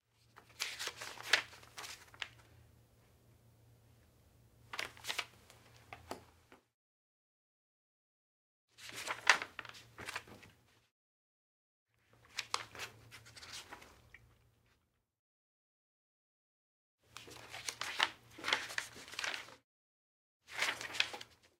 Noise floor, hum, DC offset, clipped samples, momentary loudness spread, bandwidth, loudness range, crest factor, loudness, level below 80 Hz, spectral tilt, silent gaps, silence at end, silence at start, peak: -79 dBFS; none; under 0.1%; under 0.1%; 22 LU; 16 kHz; 17 LU; 40 dB; -39 LUFS; -78 dBFS; 0 dB/octave; 6.74-8.68 s, 10.91-11.86 s, 15.19-16.98 s, 19.64-20.40 s; 0.25 s; 0.35 s; -6 dBFS